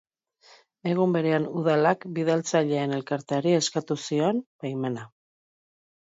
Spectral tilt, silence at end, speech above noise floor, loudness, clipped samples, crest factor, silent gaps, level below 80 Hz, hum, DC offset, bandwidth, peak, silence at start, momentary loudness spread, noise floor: -5.5 dB/octave; 1.05 s; 33 dB; -26 LUFS; under 0.1%; 18 dB; 4.46-4.59 s; -74 dBFS; none; under 0.1%; 8 kHz; -8 dBFS; 0.85 s; 8 LU; -58 dBFS